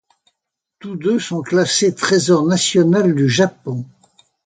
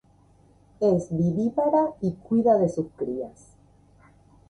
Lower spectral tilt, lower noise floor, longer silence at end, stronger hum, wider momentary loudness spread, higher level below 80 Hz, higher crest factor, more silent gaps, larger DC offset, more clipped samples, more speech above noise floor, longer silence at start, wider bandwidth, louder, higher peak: second, -4.5 dB/octave vs -9.5 dB/octave; first, -78 dBFS vs -57 dBFS; second, 0.6 s vs 1.2 s; neither; first, 14 LU vs 10 LU; about the same, -60 dBFS vs -58 dBFS; about the same, 16 dB vs 16 dB; neither; neither; neither; first, 63 dB vs 34 dB; about the same, 0.85 s vs 0.8 s; about the same, 9.6 kHz vs 10.5 kHz; first, -16 LUFS vs -24 LUFS; first, 0 dBFS vs -10 dBFS